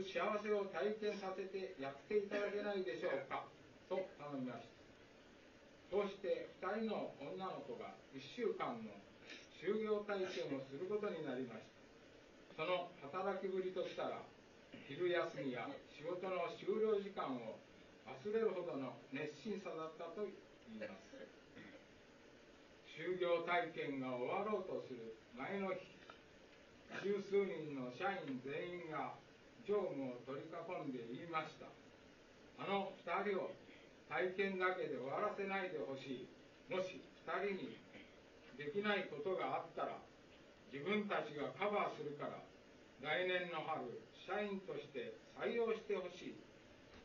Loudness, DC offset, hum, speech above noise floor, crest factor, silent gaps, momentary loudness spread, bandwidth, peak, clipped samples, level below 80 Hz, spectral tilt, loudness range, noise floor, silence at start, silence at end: -44 LUFS; under 0.1%; none; 21 dB; 20 dB; none; 22 LU; 7.2 kHz; -24 dBFS; under 0.1%; -80 dBFS; -3.5 dB/octave; 4 LU; -64 dBFS; 0 s; 0 s